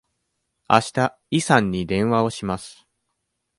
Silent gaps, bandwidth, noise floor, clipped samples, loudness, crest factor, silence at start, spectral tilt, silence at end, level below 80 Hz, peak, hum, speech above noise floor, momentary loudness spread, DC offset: none; 11.5 kHz; -76 dBFS; under 0.1%; -21 LUFS; 22 dB; 0.7 s; -5 dB/octave; 0.85 s; -50 dBFS; 0 dBFS; none; 56 dB; 10 LU; under 0.1%